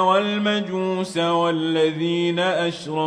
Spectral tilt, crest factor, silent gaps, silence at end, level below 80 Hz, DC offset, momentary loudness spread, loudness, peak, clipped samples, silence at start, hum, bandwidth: -5.5 dB/octave; 16 dB; none; 0 s; -68 dBFS; under 0.1%; 4 LU; -21 LUFS; -6 dBFS; under 0.1%; 0 s; none; 10.5 kHz